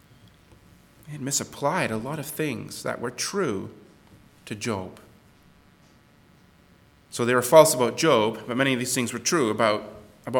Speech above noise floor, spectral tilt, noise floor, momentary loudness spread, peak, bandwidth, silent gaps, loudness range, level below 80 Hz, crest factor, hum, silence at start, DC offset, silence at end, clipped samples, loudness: 33 dB; -4 dB/octave; -56 dBFS; 18 LU; 0 dBFS; 19 kHz; none; 15 LU; -64 dBFS; 26 dB; none; 1.05 s; under 0.1%; 0 s; under 0.1%; -24 LUFS